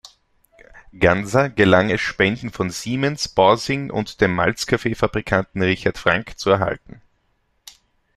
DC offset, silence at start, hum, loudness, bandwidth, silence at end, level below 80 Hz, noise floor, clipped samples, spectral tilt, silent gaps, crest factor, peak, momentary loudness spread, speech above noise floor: under 0.1%; 0.75 s; none; -19 LUFS; 13.5 kHz; 1.4 s; -46 dBFS; -66 dBFS; under 0.1%; -5 dB/octave; none; 20 dB; 0 dBFS; 8 LU; 47 dB